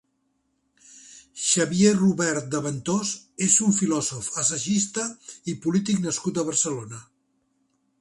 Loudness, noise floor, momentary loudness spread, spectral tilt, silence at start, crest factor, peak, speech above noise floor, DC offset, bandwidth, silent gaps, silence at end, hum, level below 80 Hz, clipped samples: -23 LUFS; -72 dBFS; 13 LU; -4 dB/octave; 0.95 s; 20 dB; -4 dBFS; 48 dB; under 0.1%; 11.5 kHz; none; 1 s; none; -64 dBFS; under 0.1%